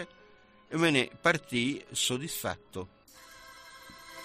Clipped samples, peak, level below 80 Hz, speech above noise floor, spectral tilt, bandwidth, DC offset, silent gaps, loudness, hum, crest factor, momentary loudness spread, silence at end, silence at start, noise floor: under 0.1%; -12 dBFS; -66 dBFS; 28 dB; -3.5 dB/octave; 15.5 kHz; under 0.1%; none; -30 LUFS; none; 22 dB; 23 LU; 0 s; 0 s; -59 dBFS